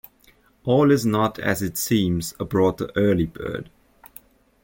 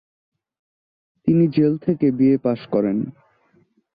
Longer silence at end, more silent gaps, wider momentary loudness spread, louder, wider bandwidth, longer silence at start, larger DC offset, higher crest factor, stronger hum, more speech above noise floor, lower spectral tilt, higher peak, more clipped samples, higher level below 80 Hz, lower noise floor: first, 1 s vs 0.85 s; neither; first, 13 LU vs 9 LU; second, -22 LUFS vs -19 LUFS; first, 17 kHz vs 5 kHz; second, 0.65 s vs 1.25 s; neither; about the same, 16 dB vs 16 dB; neither; second, 36 dB vs 42 dB; second, -6 dB/octave vs -12.5 dB/octave; about the same, -6 dBFS vs -6 dBFS; neither; first, -48 dBFS vs -60 dBFS; about the same, -57 dBFS vs -60 dBFS